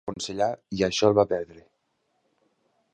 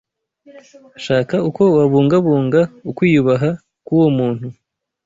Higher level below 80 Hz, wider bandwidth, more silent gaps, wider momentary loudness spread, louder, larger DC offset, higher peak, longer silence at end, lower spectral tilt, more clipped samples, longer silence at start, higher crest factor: about the same, -56 dBFS vs -54 dBFS; first, 9.8 kHz vs 7.8 kHz; neither; about the same, 11 LU vs 10 LU; second, -25 LUFS vs -15 LUFS; neither; second, -6 dBFS vs -2 dBFS; first, 1.35 s vs 0.55 s; second, -4.5 dB/octave vs -8.5 dB/octave; neither; second, 0.05 s vs 0.55 s; first, 22 dB vs 14 dB